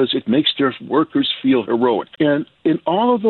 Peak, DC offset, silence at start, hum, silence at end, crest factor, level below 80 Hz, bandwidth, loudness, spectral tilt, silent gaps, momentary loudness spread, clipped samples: -6 dBFS; under 0.1%; 0 s; none; 0 s; 12 dB; -62 dBFS; 4.4 kHz; -18 LUFS; -9 dB/octave; none; 4 LU; under 0.1%